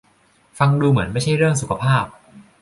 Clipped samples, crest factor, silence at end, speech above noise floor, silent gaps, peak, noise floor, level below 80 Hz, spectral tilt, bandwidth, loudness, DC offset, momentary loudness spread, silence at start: under 0.1%; 16 dB; 0.2 s; 40 dB; none; -2 dBFS; -57 dBFS; -46 dBFS; -6 dB/octave; 11.5 kHz; -18 LUFS; under 0.1%; 4 LU; 0.55 s